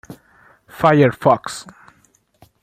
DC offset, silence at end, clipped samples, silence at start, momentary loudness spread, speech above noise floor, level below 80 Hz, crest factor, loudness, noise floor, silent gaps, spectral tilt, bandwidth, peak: under 0.1%; 1 s; under 0.1%; 0.1 s; 17 LU; 43 dB; -56 dBFS; 18 dB; -15 LUFS; -58 dBFS; none; -6.5 dB/octave; 15.5 kHz; -2 dBFS